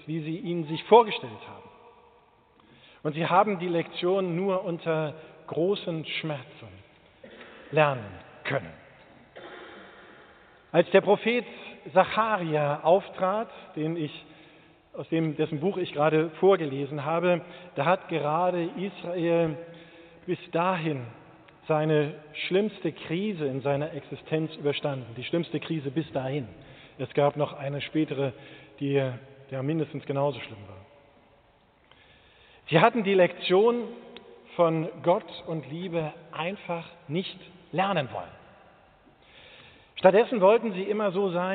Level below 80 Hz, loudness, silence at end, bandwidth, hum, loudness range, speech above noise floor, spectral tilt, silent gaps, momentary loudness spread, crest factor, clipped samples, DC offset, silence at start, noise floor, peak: -70 dBFS; -27 LUFS; 0 s; 4.6 kHz; none; 7 LU; 35 dB; -5 dB/octave; none; 21 LU; 24 dB; under 0.1%; under 0.1%; 0.05 s; -62 dBFS; -4 dBFS